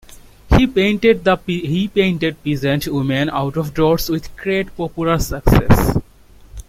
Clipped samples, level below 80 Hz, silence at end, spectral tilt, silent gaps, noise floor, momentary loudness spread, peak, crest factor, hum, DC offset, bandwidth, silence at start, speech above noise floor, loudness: under 0.1%; -28 dBFS; 0.05 s; -6.5 dB/octave; none; -43 dBFS; 7 LU; 0 dBFS; 16 dB; none; under 0.1%; 16.5 kHz; 0.45 s; 26 dB; -17 LUFS